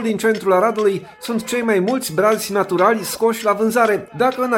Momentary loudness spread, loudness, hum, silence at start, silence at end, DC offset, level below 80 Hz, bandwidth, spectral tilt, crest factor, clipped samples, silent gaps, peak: 4 LU; -18 LUFS; none; 0 s; 0 s; under 0.1%; -60 dBFS; 17 kHz; -4.5 dB/octave; 16 dB; under 0.1%; none; -2 dBFS